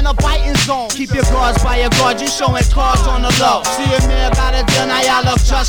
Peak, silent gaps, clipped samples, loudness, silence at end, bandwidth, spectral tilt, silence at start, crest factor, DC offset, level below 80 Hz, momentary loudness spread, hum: -2 dBFS; none; under 0.1%; -14 LUFS; 0 s; 19 kHz; -4 dB/octave; 0 s; 12 dB; under 0.1%; -16 dBFS; 3 LU; none